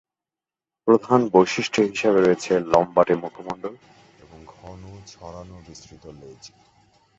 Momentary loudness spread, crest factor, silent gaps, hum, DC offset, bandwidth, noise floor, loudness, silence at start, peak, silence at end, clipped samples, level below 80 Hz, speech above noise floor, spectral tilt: 24 LU; 22 dB; none; none; under 0.1%; 8 kHz; under -90 dBFS; -20 LUFS; 0.85 s; -2 dBFS; 0.7 s; under 0.1%; -56 dBFS; over 68 dB; -5.5 dB/octave